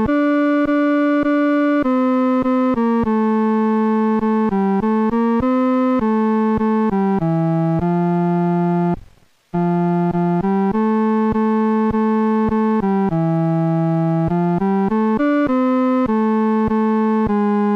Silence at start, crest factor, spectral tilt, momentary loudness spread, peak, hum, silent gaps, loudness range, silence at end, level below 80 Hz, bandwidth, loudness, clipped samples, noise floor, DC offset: 0 s; 8 dB; -10 dB/octave; 2 LU; -10 dBFS; none; none; 2 LU; 0 s; -44 dBFS; 5.6 kHz; -17 LUFS; under 0.1%; -49 dBFS; under 0.1%